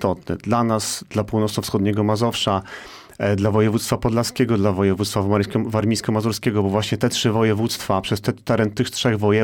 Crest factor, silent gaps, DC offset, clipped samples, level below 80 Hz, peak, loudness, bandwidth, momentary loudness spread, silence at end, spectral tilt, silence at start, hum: 14 dB; none; 0.1%; under 0.1%; -48 dBFS; -6 dBFS; -20 LUFS; 18 kHz; 5 LU; 0 s; -5.5 dB/octave; 0 s; none